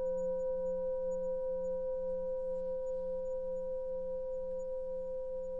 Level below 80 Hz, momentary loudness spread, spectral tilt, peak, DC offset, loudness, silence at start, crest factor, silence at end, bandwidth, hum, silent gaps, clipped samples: -54 dBFS; 4 LU; -8 dB/octave; -28 dBFS; under 0.1%; -38 LUFS; 0 s; 8 dB; 0 s; 7.4 kHz; none; none; under 0.1%